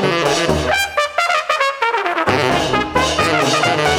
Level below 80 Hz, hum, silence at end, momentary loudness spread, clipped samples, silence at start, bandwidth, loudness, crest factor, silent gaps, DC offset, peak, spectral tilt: -38 dBFS; none; 0 s; 3 LU; under 0.1%; 0 s; 18.5 kHz; -16 LUFS; 16 dB; none; under 0.1%; 0 dBFS; -3.5 dB/octave